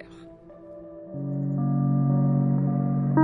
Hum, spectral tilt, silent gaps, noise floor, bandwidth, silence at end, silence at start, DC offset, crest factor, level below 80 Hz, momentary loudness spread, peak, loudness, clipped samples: none; -12.5 dB/octave; none; -46 dBFS; 2.1 kHz; 0 s; 0 s; under 0.1%; 18 dB; -62 dBFS; 21 LU; -8 dBFS; -25 LUFS; under 0.1%